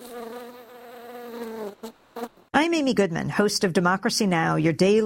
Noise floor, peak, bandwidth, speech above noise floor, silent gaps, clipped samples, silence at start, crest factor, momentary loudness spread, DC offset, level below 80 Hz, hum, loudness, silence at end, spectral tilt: -44 dBFS; -8 dBFS; 16.5 kHz; 22 dB; none; under 0.1%; 0 s; 18 dB; 20 LU; under 0.1%; -60 dBFS; none; -22 LUFS; 0 s; -5 dB/octave